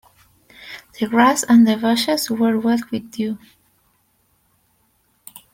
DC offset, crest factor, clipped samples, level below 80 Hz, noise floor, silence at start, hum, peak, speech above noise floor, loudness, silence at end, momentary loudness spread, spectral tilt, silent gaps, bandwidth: under 0.1%; 18 dB; under 0.1%; -62 dBFS; -63 dBFS; 0.6 s; none; -2 dBFS; 46 dB; -17 LUFS; 2.15 s; 20 LU; -4 dB/octave; none; 16.5 kHz